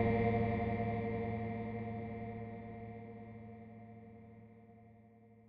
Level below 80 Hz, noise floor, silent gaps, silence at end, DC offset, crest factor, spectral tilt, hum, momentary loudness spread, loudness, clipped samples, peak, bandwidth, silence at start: -56 dBFS; -62 dBFS; none; 0 s; under 0.1%; 20 dB; -8 dB/octave; none; 23 LU; -39 LUFS; under 0.1%; -20 dBFS; 4.9 kHz; 0 s